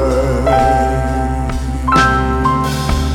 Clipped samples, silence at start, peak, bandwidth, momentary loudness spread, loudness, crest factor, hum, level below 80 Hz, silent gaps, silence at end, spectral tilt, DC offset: under 0.1%; 0 s; 0 dBFS; 15.5 kHz; 7 LU; -14 LUFS; 14 dB; none; -20 dBFS; none; 0 s; -6 dB/octave; under 0.1%